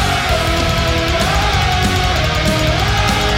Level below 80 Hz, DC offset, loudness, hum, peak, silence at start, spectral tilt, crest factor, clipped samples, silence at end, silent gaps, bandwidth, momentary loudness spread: -22 dBFS; under 0.1%; -15 LUFS; none; -4 dBFS; 0 s; -4 dB/octave; 10 dB; under 0.1%; 0 s; none; 16.5 kHz; 1 LU